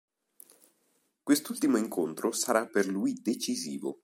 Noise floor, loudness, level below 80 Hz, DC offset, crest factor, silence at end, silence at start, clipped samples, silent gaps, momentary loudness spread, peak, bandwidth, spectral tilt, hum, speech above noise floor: -74 dBFS; -30 LUFS; -82 dBFS; under 0.1%; 22 dB; 0.1 s; 1.25 s; under 0.1%; none; 6 LU; -10 dBFS; 16.5 kHz; -3.5 dB/octave; none; 44 dB